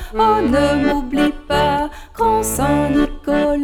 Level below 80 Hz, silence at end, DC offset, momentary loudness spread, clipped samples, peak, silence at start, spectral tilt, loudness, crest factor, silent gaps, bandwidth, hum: -30 dBFS; 0 s; under 0.1%; 4 LU; under 0.1%; -4 dBFS; 0 s; -5 dB/octave; -17 LUFS; 12 dB; none; 19.5 kHz; none